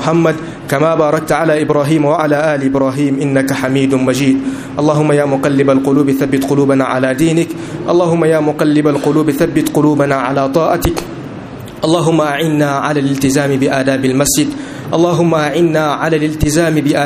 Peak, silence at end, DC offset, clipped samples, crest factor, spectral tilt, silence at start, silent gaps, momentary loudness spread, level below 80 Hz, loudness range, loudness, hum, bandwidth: 0 dBFS; 0 s; under 0.1%; under 0.1%; 12 dB; -5.5 dB/octave; 0 s; none; 5 LU; -38 dBFS; 2 LU; -13 LUFS; none; 15.5 kHz